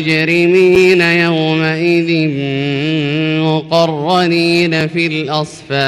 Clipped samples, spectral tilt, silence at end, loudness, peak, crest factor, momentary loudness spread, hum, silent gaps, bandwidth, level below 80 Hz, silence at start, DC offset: under 0.1%; -6 dB/octave; 0 s; -12 LUFS; -2 dBFS; 10 dB; 7 LU; none; none; 12.5 kHz; -50 dBFS; 0 s; under 0.1%